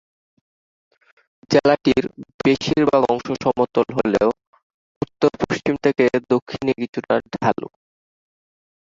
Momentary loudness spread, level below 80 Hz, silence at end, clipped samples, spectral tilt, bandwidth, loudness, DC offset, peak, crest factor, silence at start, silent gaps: 9 LU; -52 dBFS; 1.3 s; under 0.1%; -6 dB/octave; 7.8 kHz; -20 LUFS; under 0.1%; -2 dBFS; 20 dB; 1.5 s; 2.34-2.39 s, 4.47-4.53 s, 4.63-5.01 s, 6.42-6.46 s, 6.89-6.93 s